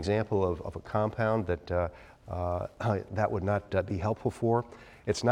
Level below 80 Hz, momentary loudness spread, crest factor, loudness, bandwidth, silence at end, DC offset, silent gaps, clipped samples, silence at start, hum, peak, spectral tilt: -52 dBFS; 7 LU; 18 dB; -31 LUFS; 10.5 kHz; 0 s; under 0.1%; none; under 0.1%; 0 s; none; -12 dBFS; -7 dB/octave